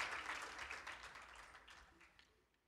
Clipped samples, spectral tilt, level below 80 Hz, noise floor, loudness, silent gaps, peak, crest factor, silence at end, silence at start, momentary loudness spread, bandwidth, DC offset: under 0.1%; -1 dB/octave; -74 dBFS; -74 dBFS; -50 LUFS; none; -28 dBFS; 26 dB; 0.35 s; 0 s; 19 LU; 15.5 kHz; under 0.1%